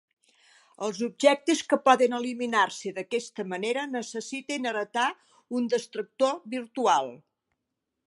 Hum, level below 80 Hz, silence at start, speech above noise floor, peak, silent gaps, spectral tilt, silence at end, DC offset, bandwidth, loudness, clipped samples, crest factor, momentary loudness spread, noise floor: none; -84 dBFS; 0.8 s; 56 dB; -6 dBFS; none; -3 dB/octave; 0.95 s; under 0.1%; 11.5 kHz; -27 LUFS; under 0.1%; 22 dB; 12 LU; -83 dBFS